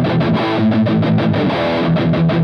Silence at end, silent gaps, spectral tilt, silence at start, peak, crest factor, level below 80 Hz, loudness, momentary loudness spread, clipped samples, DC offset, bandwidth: 0 s; none; -9 dB/octave; 0 s; -6 dBFS; 8 dB; -44 dBFS; -15 LUFS; 2 LU; under 0.1%; under 0.1%; 6.2 kHz